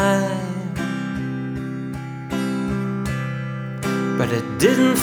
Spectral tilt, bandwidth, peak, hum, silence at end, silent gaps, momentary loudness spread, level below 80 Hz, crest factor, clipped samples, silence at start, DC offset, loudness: -5.5 dB/octave; over 20 kHz; -2 dBFS; none; 0 s; none; 10 LU; -46 dBFS; 20 dB; under 0.1%; 0 s; under 0.1%; -23 LUFS